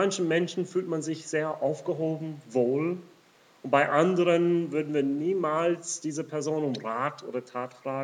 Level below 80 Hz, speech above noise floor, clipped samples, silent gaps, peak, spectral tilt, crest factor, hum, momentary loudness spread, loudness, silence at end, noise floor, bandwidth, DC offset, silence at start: -90 dBFS; 32 dB; under 0.1%; none; -10 dBFS; -5.5 dB/octave; 18 dB; none; 11 LU; -28 LUFS; 0 s; -59 dBFS; 10.5 kHz; under 0.1%; 0 s